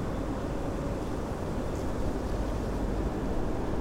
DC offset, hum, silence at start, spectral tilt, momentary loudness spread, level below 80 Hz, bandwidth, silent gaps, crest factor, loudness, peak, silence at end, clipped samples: under 0.1%; none; 0 s; -7 dB/octave; 2 LU; -36 dBFS; 16 kHz; none; 12 dB; -33 LUFS; -18 dBFS; 0 s; under 0.1%